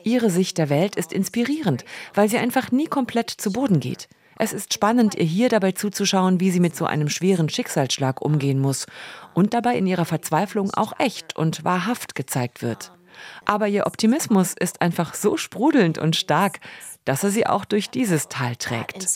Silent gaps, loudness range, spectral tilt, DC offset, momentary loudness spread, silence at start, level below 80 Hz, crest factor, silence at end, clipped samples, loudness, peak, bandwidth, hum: none; 3 LU; -5 dB/octave; under 0.1%; 8 LU; 0.05 s; -66 dBFS; 20 dB; 0 s; under 0.1%; -22 LUFS; -2 dBFS; 16.5 kHz; none